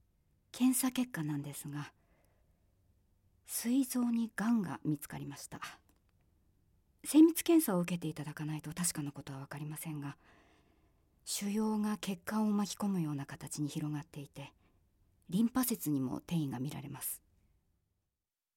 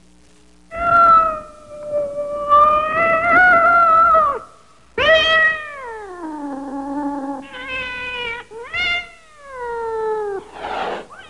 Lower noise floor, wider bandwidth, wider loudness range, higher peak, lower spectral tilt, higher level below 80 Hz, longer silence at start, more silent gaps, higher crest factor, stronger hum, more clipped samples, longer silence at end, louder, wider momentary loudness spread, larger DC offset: first, under -90 dBFS vs -51 dBFS; first, 17 kHz vs 11 kHz; second, 7 LU vs 11 LU; second, -16 dBFS vs -4 dBFS; about the same, -5 dB/octave vs -4 dB/octave; second, -70 dBFS vs -46 dBFS; second, 0.55 s vs 0.7 s; neither; first, 20 dB vs 14 dB; neither; neither; first, 1.4 s vs 0 s; second, -35 LUFS vs -16 LUFS; second, 16 LU vs 19 LU; second, under 0.1% vs 0.3%